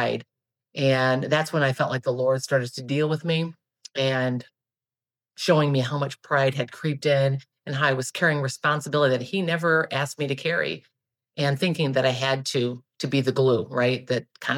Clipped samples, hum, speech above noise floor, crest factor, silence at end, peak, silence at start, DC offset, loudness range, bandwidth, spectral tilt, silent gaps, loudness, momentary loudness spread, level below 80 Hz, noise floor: under 0.1%; none; over 66 dB; 18 dB; 0 s; -6 dBFS; 0 s; under 0.1%; 3 LU; 15.5 kHz; -5.5 dB/octave; none; -24 LUFS; 8 LU; -74 dBFS; under -90 dBFS